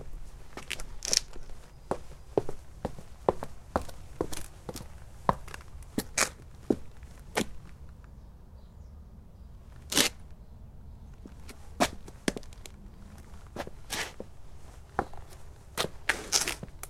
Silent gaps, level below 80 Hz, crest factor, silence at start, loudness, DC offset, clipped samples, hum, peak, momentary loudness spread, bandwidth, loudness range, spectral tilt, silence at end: none; -48 dBFS; 34 dB; 0 s; -33 LUFS; under 0.1%; under 0.1%; none; 0 dBFS; 24 LU; 16.5 kHz; 6 LU; -2.5 dB/octave; 0 s